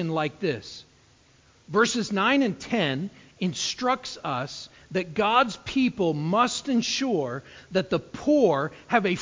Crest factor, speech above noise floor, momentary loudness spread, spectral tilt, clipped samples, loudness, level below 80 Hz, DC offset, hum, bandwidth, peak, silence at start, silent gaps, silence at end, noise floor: 20 dB; 33 dB; 11 LU; -4.5 dB/octave; under 0.1%; -25 LUFS; -60 dBFS; under 0.1%; none; 7.6 kHz; -6 dBFS; 0 s; none; 0 s; -58 dBFS